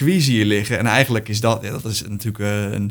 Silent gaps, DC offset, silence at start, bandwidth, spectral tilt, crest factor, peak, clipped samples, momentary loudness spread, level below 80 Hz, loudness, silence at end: none; under 0.1%; 0 s; over 20 kHz; -5 dB/octave; 18 dB; 0 dBFS; under 0.1%; 8 LU; -50 dBFS; -19 LUFS; 0 s